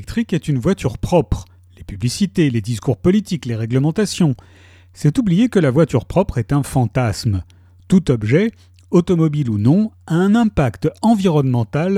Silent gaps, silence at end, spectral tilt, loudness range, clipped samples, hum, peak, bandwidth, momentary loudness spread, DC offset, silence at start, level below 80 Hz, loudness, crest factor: none; 0 s; -7 dB/octave; 3 LU; under 0.1%; none; -2 dBFS; 14.5 kHz; 7 LU; under 0.1%; 0 s; -38 dBFS; -17 LUFS; 14 dB